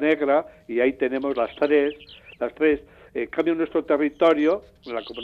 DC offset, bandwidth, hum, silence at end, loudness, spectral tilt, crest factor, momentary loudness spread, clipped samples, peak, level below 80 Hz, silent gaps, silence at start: under 0.1%; 6.6 kHz; none; 0 s; -23 LUFS; -6.5 dB/octave; 16 dB; 12 LU; under 0.1%; -8 dBFS; -58 dBFS; none; 0 s